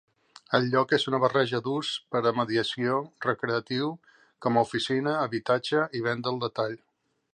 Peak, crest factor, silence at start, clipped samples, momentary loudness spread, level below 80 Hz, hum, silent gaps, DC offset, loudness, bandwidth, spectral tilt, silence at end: -8 dBFS; 20 dB; 0.5 s; under 0.1%; 6 LU; -70 dBFS; none; none; under 0.1%; -27 LUFS; 10 kHz; -5.5 dB/octave; 0.6 s